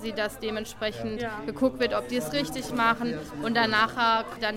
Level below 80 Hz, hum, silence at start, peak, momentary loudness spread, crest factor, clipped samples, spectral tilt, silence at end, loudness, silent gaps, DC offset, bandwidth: -52 dBFS; none; 0 s; -10 dBFS; 10 LU; 18 dB; under 0.1%; -4 dB/octave; 0 s; -27 LUFS; none; under 0.1%; 16.5 kHz